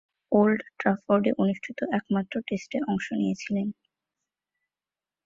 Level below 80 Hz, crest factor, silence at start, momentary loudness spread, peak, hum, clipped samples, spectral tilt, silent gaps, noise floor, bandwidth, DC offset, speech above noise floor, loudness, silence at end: -66 dBFS; 20 dB; 0.3 s; 8 LU; -8 dBFS; none; under 0.1%; -7 dB/octave; none; under -90 dBFS; 7.6 kHz; under 0.1%; over 64 dB; -27 LUFS; 1.55 s